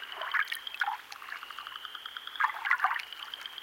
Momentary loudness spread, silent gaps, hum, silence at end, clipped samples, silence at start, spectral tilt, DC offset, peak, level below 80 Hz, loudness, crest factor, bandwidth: 13 LU; none; none; 0 s; under 0.1%; 0 s; 1.5 dB/octave; under 0.1%; -12 dBFS; -82 dBFS; -33 LUFS; 24 dB; 17 kHz